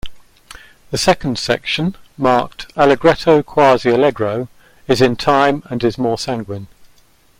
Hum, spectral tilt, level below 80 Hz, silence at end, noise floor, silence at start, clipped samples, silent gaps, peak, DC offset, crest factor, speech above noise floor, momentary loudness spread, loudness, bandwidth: none; -5 dB/octave; -42 dBFS; 0.55 s; -50 dBFS; 0.05 s; under 0.1%; none; 0 dBFS; under 0.1%; 16 dB; 35 dB; 13 LU; -15 LUFS; 16.5 kHz